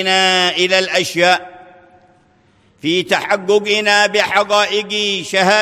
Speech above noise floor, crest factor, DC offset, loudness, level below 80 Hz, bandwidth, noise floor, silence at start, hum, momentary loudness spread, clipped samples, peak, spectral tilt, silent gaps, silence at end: 39 dB; 16 dB; under 0.1%; -14 LUFS; -62 dBFS; 16 kHz; -53 dBFS; 0 s; none; 5 LU; under 0.1%; 0 dBFS; -2.5 dB/octave; none; 0 s